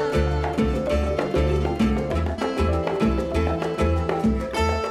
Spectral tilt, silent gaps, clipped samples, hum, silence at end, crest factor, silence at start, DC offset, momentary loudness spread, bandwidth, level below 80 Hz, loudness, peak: -7 dB/octave; none; under 0.1%; none; 0 s; 14 dB; 0 s; under 0.1%; 2 LU; 12.5 kHz; -28 dBFS; -23 LUFS; -10 dBFS